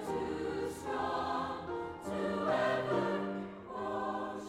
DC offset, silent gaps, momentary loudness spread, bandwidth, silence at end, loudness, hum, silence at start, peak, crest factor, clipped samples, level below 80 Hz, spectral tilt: under 0.1%; none; 9 LU; 15.5 kHz; 0 s; -36 LUFS; none; 0 s; -20 dBFS; 16 dB; under 0.1%; -62 dBFS; -6 dB/octave